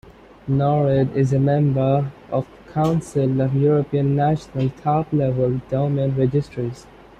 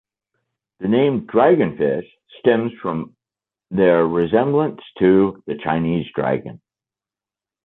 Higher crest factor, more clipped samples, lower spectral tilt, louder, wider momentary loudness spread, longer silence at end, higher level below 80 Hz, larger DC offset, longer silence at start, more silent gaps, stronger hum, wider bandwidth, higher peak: about the same, 14 dB vs 16 dB; neither; second, -9 dB/octave vs -10.5 dB/octave; about the same, -20 LUFS vs -19 LUFS; second, 8 LU vs 12 LU; second, 0.35 s vs 1.1 s; first, -48 dBFS vs -54 dBFS; neither; second, 0.45 s vs 0.8 s; neither; neither; first, 9 kHz vs 4.1 kHz; second, -6 dBFS vs -2 dBFS